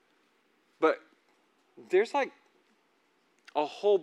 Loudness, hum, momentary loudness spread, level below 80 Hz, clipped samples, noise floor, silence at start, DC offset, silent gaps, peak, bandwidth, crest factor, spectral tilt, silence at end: -30 LUFS; none; 9 LU; under -90 dBFS; under 0.1%; -70 dBFS; 0.8 s; under 0.1%; none; -12 dBFS; 10.5 kHz; 20 dB; -4.5 dB/octave; 0 s